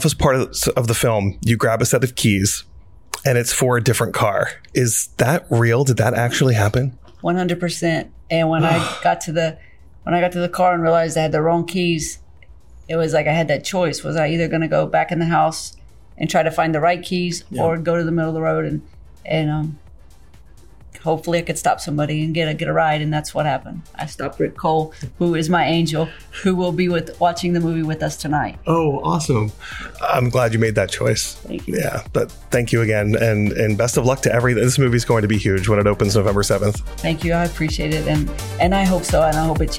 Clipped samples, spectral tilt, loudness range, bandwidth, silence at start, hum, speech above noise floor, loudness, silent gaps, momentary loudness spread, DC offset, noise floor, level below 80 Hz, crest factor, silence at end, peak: under 0.1%; -5 dB/octave; 4 LU; 17 kHz; 0 s; none; 28 dB; -19 LUFS; none; 7 LU; 0.5%; -46 dBFS; -36 dBFS; 16 dB; 0 s; -4 dBFS